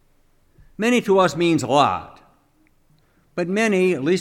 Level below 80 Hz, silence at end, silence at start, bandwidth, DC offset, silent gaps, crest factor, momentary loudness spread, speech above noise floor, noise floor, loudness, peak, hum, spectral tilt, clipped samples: -58 dBFS; 0 s; 0.8 s; 15 kHz; under 0.1%; none; 20 dB; 10 LU; 41 dB; -59 dBFS; -19 LUFS; -2 dBFS; none; -5.5 dB/octave; under 0.1%